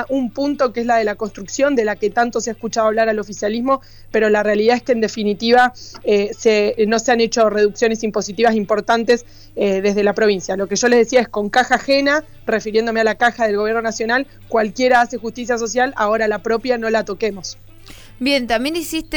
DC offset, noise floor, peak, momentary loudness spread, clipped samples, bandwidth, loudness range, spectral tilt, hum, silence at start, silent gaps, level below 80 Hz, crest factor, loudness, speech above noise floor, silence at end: under 0.1%; -39 dBFS; -2 dBFS; 7 LU; under 0.1%; 20 kHz; 3 LU; -3.5 dB/octave; none; 0 s; none; -46 dBFS; 14 dB; -17 LUFS; 22 dB; 0 s